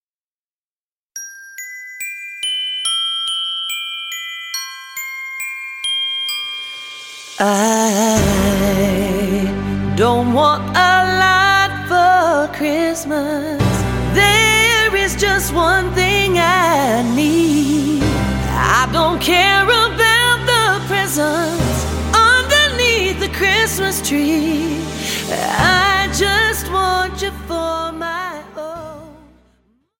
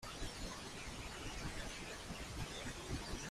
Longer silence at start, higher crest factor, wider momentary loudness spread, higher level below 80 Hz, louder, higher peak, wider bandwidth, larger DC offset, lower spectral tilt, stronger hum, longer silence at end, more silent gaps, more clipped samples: first, 1.15 s vs 0 s; about the same, 14 dB vs 16 dB; first, 14 LU vs 2 LU; first, -32 dBFS vs -52 dBFS; first, -15 LUFS vs -47 LUFS; first, -2 dBFS vs -30 dBFS; about the same, 17 kHz vs 15.5 kHz; neither; about the same, -3.5 dB/octave vs -3.5 dB/octave; neither; first, 0.85 s vs 0 s; neither; neither